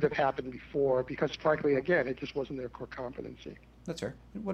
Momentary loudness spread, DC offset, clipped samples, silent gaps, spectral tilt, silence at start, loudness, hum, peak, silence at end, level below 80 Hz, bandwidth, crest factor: 15 LU; under 0.1%; under 0.1%; none; -6.5 dB/octave; 0 s; -32 LUFS; none; -16 dBFS; 0 s; -58 dBFS; 9.6 kHz; 18 dB